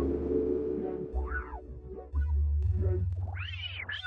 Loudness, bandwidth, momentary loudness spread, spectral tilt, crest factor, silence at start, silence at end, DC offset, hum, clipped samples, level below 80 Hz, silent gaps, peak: -33 LUFS; 4.6 kHz; 10 LU; -9 dB/octave; 14 dB; 0 s; 0 s; under 0.1%; none; under 0.1%; -36 dBFS; none; -18 dBFS